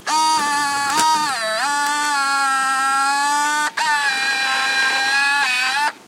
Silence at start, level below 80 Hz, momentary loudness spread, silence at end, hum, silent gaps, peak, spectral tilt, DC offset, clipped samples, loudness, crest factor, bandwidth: 0 s; -70 dBFS; 3 LU; 0.1 s; none; none; -4 dBFS; 0.5 dB/octave; under 0.1%; under 0.1%; -17 LUFS; 14 dB; 16 kHz